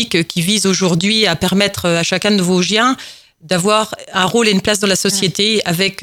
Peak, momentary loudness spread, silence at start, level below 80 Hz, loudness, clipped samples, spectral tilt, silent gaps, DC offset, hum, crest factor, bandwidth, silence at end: 0 dBFS; 4 LU; 0 s; -48 dBFS; -14 LUFS; under 0.1%; -3.5 dB/octave; none; under 0.1%; none; 14 dB; 17 kHz; 0 s